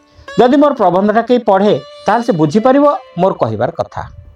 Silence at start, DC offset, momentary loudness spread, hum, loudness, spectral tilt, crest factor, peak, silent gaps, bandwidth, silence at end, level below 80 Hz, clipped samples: 0.3 s; under 0.1%; 9 LU; none; -12 LUFS; -7 dB/octave; 12 dB; 0 dBFS; none; 10.5 kHz; 0.25 s; -46 dBFS; under 0.1%